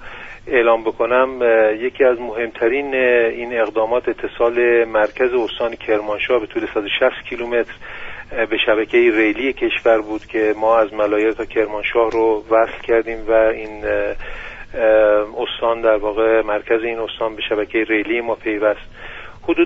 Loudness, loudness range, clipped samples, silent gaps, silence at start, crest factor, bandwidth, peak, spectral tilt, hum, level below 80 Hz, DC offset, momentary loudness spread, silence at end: -17 LUFS; 3 LU; under 0.1%; none; 0 s; 16 dB; 7.2 kHz; -2 dBFS; -1.5 dB/octave; none; -42 dBFS; under 0.1%; 10 LU; 0 s